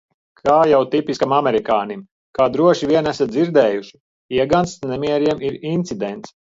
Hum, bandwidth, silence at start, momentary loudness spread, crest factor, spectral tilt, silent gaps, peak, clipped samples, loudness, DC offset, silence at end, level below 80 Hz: none; 7.8 kHz; 0.45 s; 12 LU; 16 dB; -6 dB/octave; 2.11-2.33 s, 4.00-4.29 s; -2 dBFS; under 0.1%; -18 LUFS; under 0.1%; 0.3 s; -52 dBFS